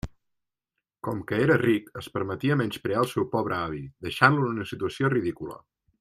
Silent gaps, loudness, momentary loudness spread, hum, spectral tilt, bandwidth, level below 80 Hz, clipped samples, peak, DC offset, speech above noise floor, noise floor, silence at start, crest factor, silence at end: none; -26 LUFS; 14 LU; none; -6.5 dB/octave; 15 kHz; -56 dBFS; under 0.1%; -2 dBFS; under 0.1%; 59 dB; -85 dBFS; 0.05 s; 24 dB; 0.45 s